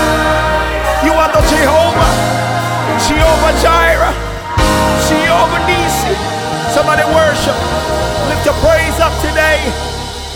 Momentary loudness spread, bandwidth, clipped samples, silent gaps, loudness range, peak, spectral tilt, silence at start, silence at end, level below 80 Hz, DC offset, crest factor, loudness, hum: 6 LU; 19.5 kHz; under 0.1%; none; 2 LU; 0 dBFS; -4 dB/octave; 0 s; 0 s; -22 dBFS; under 0.1%; 12 dB; -12 LUFS; none